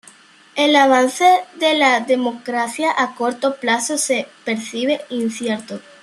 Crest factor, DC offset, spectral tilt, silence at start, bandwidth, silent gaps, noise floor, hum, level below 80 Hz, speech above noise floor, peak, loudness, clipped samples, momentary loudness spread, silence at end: 16 dB; under 0.1%; -2 dB/octave; 0.55 s; 13 kHz; none; -47 dBFS; none; -72 dBFS; 29 dB; -2 dBFS; -17 LUFS; under 0.1%; 10 LU; 0.2 s